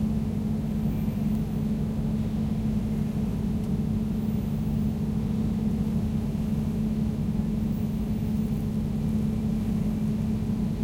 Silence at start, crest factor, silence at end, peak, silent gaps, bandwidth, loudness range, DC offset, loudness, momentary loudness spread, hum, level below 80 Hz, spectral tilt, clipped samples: 0 s; 12 dB; 0 s; -14 dBFS; none; 16 kHz; 0 LU; under 0.1%; -28 LUFS; 1 LU; 50 Hz at -35 dBFS; -36 dBFS; -8.5 dB/octave; under 0.1%